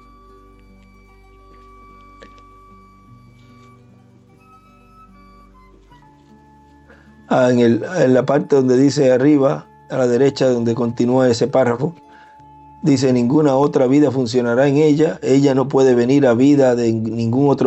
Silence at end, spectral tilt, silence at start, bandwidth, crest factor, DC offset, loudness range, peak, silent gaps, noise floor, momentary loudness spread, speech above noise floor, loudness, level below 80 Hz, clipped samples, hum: 0 s; -7 dB/octave; 7.3 s; 8.4 kHz; 14 dB; under 0.1%; 5 LU; -4 dBFS; none; -48 dBFS; 6 LU; 34 dB; -15 LUFS; -54 dBFS; under 0.1%; none